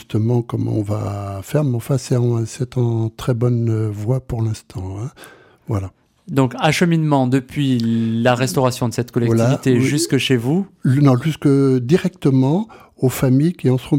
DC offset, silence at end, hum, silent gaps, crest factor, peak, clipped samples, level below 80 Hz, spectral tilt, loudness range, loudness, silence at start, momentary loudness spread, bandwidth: under 0.1%; 0 s; none; none; 14 dB; -2 dBFS; under 0.1%; -48 dBFS; -6.5 dB/octave; 5 LU; -18 LUFS; 0.1 s; 9 LU; 16.5 kHz